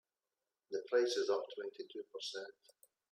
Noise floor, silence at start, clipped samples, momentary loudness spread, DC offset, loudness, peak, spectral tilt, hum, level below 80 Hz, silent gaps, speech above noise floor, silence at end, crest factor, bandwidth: under -90 dBFS; 0.7 s; under 0.1%; 14 LU; under 0.1%; -39 LUFS; -22 dBFS; -1.5 dB/octave; none; under -90 dBFS; none; over 51 dB; 0.6 s; 20 dB; 15.5 kHz